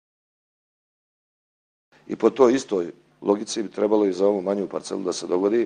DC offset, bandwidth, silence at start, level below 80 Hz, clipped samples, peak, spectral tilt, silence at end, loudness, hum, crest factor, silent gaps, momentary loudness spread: under 0.1%; 10 kHz; 2.1 s; -70 dBFS; under 0.1%; -4 dBFS; -5 dB/octave; 0 s; -23 LUFS; none; 20 dB; none; 10 LU